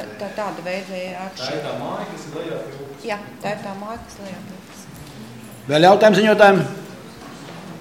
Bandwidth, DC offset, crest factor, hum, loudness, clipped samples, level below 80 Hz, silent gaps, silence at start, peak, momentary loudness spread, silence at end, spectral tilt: 16.5 kHz; 0.1%; 20 dB; none; -19 LUFS; under 0.1%; -58 dBFS; none; 0 s; 0 dBFS; 25 LU; 0 s; -5.5 dB/octave